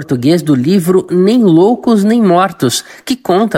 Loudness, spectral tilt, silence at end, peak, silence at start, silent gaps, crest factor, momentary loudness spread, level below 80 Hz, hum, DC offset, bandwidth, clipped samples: -11 LUFS; -6 dB/octave; 0 s; 0 dBFS; 0 s; none; 10 dB; 6 LU; -54 dBFS; none; under 0.1%; 16.5 kHz; under 0.1%